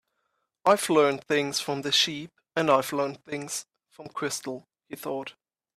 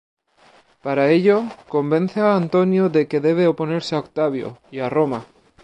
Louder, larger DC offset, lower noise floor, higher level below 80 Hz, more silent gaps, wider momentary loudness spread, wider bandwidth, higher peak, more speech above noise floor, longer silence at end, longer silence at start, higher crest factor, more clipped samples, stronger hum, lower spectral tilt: second, -26 LUFS vs -19 LUFS; neither; first, -78 dBFS vs -54 dBFS; second, -74 dBFS vs -64 dBFS; neither; first, 16 LU vs 10 LU; first, 15.5 kHz vs 9.6 kHz; second, -8 dBFS vs -4 dBFS; first, 51 dB vs 35 dB; about the same, 0.45 s vs 0.4 s; second, 0.65 s vs 0.85 s; about the same, 20 dB vs 16 dB; neither; neither; second, -3 dB/octave vs -7.5 dB/octave